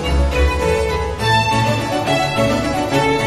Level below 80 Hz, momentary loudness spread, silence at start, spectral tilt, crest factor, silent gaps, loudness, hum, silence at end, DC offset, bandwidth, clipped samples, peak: -24 dBFS; 3 LU; 0 s; -5 dB/octave; 14 dB; none; -17 LUFS; none; 0 s; under 0.1%; 13 kHz; under 0.1%; -2 dBFS